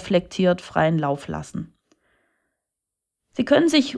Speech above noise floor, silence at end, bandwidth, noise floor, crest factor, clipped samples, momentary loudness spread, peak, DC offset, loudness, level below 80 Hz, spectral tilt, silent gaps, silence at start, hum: 63 dB; 0 s; 11 kHz; -83 dBFS; 18 dB; under 0.1%; 18 LU; -6 dBFS; under 0.1%; -21 LUFS; -54 dBFS; -6 dB/octave; none; 0 s; none